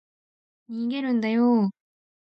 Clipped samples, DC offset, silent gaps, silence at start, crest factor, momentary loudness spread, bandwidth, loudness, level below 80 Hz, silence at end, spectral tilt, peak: under 0.1%; under 0.1%; none; 0.7 s; 14 dB; 10 LU; 5.6 kHz; -24 LUFS; -78 dBFS; 0.55 s; -8.5 dB/octave; -12 dBFS